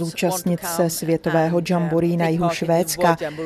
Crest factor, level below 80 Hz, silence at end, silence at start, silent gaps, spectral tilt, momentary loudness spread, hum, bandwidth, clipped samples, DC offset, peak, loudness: 18 dB; -52 dBFS; 0 s; 0 s; none; -5.5 dB/octave; 3 LU; none; 13.5 kHz; under 0.1%; under 0.1%; -4 dBFS; -20 LUFS